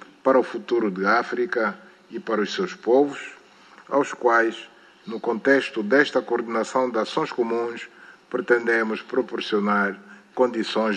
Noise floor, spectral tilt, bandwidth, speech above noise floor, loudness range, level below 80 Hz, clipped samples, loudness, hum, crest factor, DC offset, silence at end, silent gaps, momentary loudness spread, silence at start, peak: -50 dBFS; -5 dB/octave; 10 kHz; 27 dB; 2 LU; -76 dBFS; under 0.1%; -23 LUFS; none; 20 dB; under 0.1%; 0 s; none; 16 LU; 0.25 s; -4 dBFS